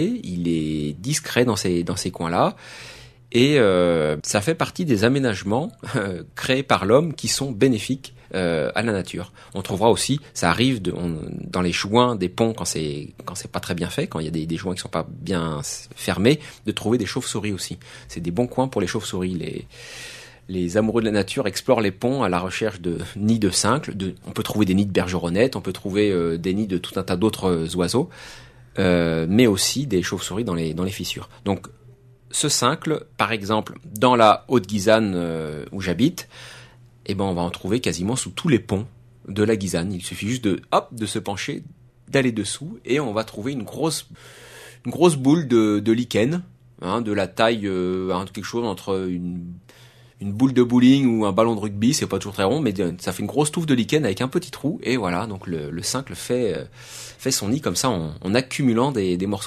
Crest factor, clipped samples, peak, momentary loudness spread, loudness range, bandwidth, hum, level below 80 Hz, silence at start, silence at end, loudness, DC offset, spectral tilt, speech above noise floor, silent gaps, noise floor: 22 dB; under 0.1%; 0 dBFS; 12 LU; 5 LU; 13.5 kHz; none; -50 dBFS; 0 s; 0 s; -22 LUFS; under 0.1%; -5 dB/octave; 27 dB; none; -49 dBFS